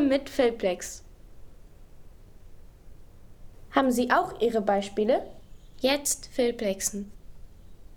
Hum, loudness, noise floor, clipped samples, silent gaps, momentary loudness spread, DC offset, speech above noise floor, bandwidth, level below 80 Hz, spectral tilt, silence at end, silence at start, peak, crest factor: none; -27 LUFS; -47 dBFS; under 0.1%; none; 13 LU; under 0.1%; 21 dB; 19.5 kHz; -50 dBFS; -3.5 dB/octave; 0 s; 0 s; -8 dBFS; 22 dB